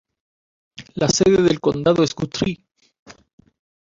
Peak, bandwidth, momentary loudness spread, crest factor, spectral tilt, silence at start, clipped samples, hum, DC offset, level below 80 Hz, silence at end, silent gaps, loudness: -4 dBFS; 7.8 kHz; 11 LU; 18 dB; -5 dB/octave; 0.8 s; under 0.1%; none; under 0.1%; -48 dBFS; 0.75 s; 2.99-3.06 s; -18 LUFS